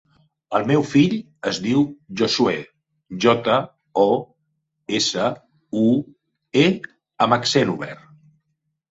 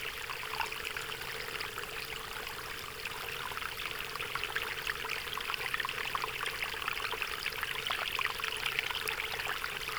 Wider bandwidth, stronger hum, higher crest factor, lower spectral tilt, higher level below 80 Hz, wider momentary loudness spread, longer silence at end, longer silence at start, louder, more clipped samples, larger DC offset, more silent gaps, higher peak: second, 8 kHz vs over 20 kHz; neither; second, 20 dB vs 26 dB; first, -5 dB/octave vs -1 dB/octave; about the same, -60 dBFS vs -58 dBFS; first, 12 LU vs 6 LU; first, 0.95 s vs 0 s; first, 0.5 s vs 0 s; first, -20 LUFS vs -35 LUFS; neither; neither; neither; first, -2 dBFS vs -12 dBFS